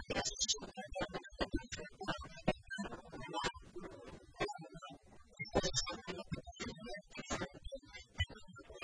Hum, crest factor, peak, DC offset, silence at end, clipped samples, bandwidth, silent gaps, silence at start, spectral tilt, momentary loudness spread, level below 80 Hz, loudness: none; 24 dB; -20 dBFS; under 0.1%; 0 s; under 0.1%; 10.5 kHz; none; 0 s; -3 dB/octave; 16 LU; -54 dBFS; -42 LUFS